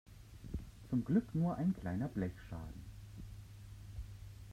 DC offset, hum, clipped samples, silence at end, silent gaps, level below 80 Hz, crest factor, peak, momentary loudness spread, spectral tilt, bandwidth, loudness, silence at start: under 0.1%; none; under 0.1%; 0 s; none; -54 dBFS; 20 dB; -20 dBFS; 19 LU; -8.5 dB/octave; 15 kHz; -39 LUFS; 0.05 s